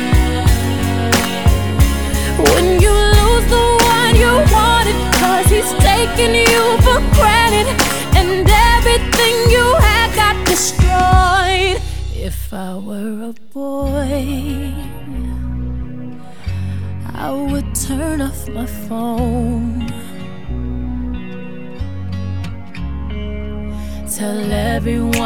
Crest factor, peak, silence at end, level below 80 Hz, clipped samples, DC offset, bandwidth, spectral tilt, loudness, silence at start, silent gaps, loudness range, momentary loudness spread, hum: 14 dB; 0 dBFS; 0 s; -20 dBFS; under 0.1%; 3%; over 20 kHz; -4.5 dB/octave; -14 LUFS; 0 s; none; 13 LU; 16 LU; none